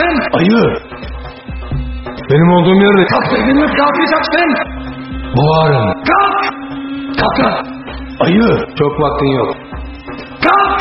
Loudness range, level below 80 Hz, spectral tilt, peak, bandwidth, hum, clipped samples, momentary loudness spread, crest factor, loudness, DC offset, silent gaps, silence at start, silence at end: 3 LU; -30 dBFS; -5 dB/octave; 0 dBFS; 6 kHz; none; under 0.1%; 17 LU; 12 dB; -12 LUFS; under 0.1%; none; 0 s; 0 s